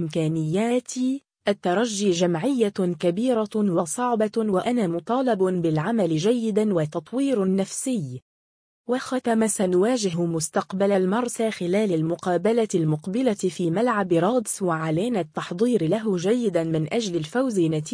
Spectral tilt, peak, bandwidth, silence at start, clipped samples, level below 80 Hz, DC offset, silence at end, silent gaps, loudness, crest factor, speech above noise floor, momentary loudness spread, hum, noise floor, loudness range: -5.5 dB/octave; -8 dBFS; 10.5 kHz; 0 s; under 0.1%; -66 dBFS; under 0.1%; 0 s; 8.22-8.84 s; -23 LUFS; 14 dB; over 67 dB; 5 LU; none; under -90 dBFS; 2 LU